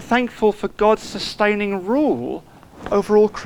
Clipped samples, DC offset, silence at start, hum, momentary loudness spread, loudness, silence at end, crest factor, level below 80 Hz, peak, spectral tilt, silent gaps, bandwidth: under 0.1%; under 0.1%; 0 s; none; 10 LU; -19 LUFS; 0 s; 16 dB; -46 dBFS; -4 dBFS; -5.5 dB/octave; none; 12.5 kHz